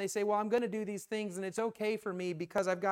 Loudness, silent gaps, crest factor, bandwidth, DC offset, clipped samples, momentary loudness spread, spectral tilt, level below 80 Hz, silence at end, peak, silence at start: -35 LUFS; none; 16 dB; 16.5 kHz; under 0.1%; under 0.1%; 6 LU; -5 dB/octave; -78 dBFS; 0 s; -18 dBFS; 0 s